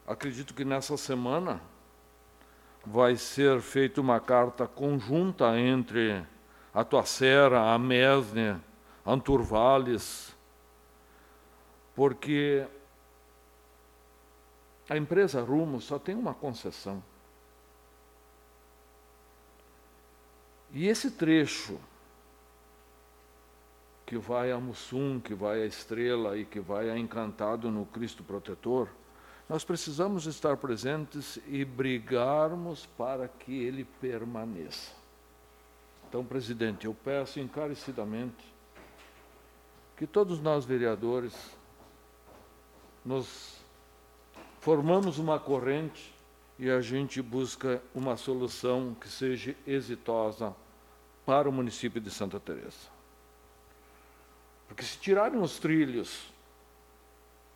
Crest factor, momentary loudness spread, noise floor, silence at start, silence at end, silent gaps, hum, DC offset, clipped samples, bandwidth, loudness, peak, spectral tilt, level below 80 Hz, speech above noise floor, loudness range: 22 dB; 15 LU; -59 dBFS; 0.05 s; 1.25 s; none; none; under 0.1%; under 0.1%; 18.5 kHz; -30 LUFS; -10 dBFS; -5.5 dB/octave; -60 dBFS; 29 dB; 12 LU